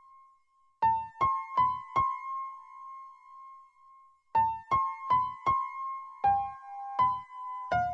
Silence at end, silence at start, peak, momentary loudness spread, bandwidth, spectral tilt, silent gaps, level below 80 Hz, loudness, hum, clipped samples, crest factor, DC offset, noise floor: 0 s; 0.8 s; -16 dBFS; 18 LU; 7.2 kHz; -6 dB/octave; none; -62 dBFS; -30 LUFS; none; under 0.1%; 16 dB; under 0.1%; -67 dBFS